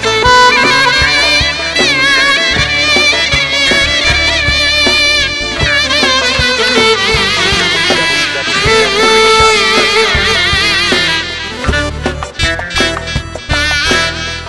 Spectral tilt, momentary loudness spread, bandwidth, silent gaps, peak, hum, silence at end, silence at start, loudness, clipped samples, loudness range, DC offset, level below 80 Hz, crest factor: -2.5 dB/octave; 8 LU; 12 kHz; none; 0 dBFS; none; 0 s; 0 s; -9 LUFS; under 0.1%; 4 LU; 0.7%; -26 dBFS; 10 dB